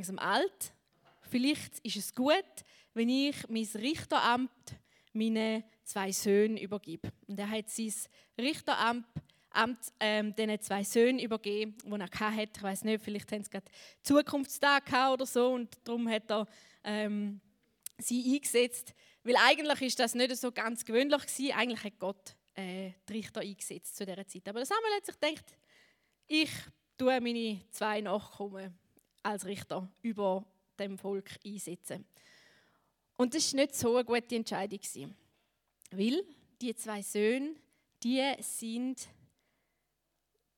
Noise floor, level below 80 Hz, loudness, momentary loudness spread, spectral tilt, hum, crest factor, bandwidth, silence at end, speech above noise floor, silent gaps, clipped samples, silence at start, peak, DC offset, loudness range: -83 dBFS; -76 dBFS; -33 LUFS; 15 LU; -3 dB/octave; none; 26 dB; 19 kHz; 1.5 s; 49 dB; none; under 0.1%; 0 s; -8 dBFS; under 0.1%; 8 LU